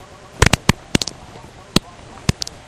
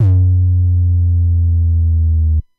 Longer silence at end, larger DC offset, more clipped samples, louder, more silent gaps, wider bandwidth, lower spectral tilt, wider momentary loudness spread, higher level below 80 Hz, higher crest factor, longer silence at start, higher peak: first, 0.35 s vs 0.2 s; neither; neither; second, -19 LUFS vs -14 LUFS; neither; first, over 20 kHz vs 0.9 kHz; second, -4 dB/octave vs -12.5 dB/octave; first, 24 LU vs 2 LU; second, -32 dBFS vs -18 dBFS; first, 22 dB vs 8 dB; first, 0.4 s vs 0 s; first, 0 dBFS vs -4 dBFS